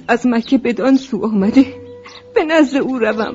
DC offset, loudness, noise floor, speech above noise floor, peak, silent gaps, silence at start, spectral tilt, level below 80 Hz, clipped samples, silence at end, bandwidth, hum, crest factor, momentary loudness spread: under 0.1%; -15 LUFS; -36 dBFS; 22 dB; 0 dBFS; none; 0.1 s; -6 dB/octave; -52 dBFS; under 0.1%; 0 s; 7.8 kHz; none; 16 dB; 7 LU